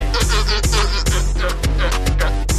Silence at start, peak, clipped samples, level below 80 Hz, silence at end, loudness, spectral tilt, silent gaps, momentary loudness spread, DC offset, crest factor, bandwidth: 0 s; -4 dBFS; under 0.1%; -18 dBFS; 0 s; -18 LUFS; -3.5 dB/octave; none; 3 LU; under 0.1%; 12 dB; 14 kHz